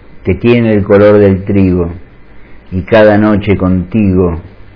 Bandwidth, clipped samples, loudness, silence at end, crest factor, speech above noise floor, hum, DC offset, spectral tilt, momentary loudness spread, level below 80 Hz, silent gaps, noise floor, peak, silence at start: 5.4 kHz; 2%; -9 LUFS; 0.25 s; 10 dB; 24 dB; none; 0.6%; -10.5 dB/octave; 11 LU; -32 dBFS; none; -32 dBFS; 0 dBFS; 0.15 s